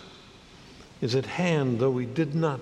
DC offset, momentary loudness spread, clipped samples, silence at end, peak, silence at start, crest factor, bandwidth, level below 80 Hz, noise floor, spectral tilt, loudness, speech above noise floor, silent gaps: under 0.1%; 6 LU; under 0.1%; 0 s; -10 dBFS; 0 s; 18 dB; 10.5 kHz; -60 dBFS; -50 dBFS; -7 dB/octave; -27 LUFS; 24 dB; none